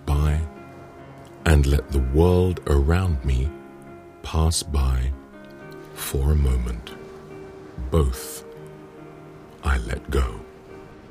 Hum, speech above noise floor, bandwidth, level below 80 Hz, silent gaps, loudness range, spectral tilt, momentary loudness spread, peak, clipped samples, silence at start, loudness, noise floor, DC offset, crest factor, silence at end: none; 22 dB; 15.5 kHz; -26 dBFS; none; 7 LU; -6 dB/octave; 23 LU; -2 dBFS; under 0.1%; 0 s; -23 LUFS; -43 dBFS; under 0.1%; 20 dB; 0.15 s